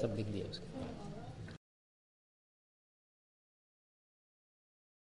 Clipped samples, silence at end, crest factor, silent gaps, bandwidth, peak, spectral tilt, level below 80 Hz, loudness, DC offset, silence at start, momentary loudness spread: under 0.1%; 3.6 s; 26 dB; none; 11.5 kHz; -22 dBFS; -7 dB/octave; -64 dBFS; -45 LUFS; under 0.1%; 0 s; 12 LU